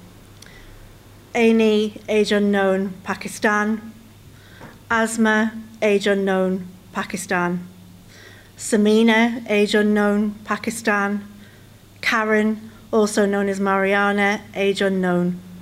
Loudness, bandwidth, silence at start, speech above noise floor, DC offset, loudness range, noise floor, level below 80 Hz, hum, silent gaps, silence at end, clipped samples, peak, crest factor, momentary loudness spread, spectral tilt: -20 LUFS; 15.5 kHz; 0.05 s; 27 dB; under 0.1%; 3 LU; -46 dBFS; -54 dBFS; none; none; 0 s; under 0.1%; -6 dBFS; 14 dB; 10 LU; -5 dB/octave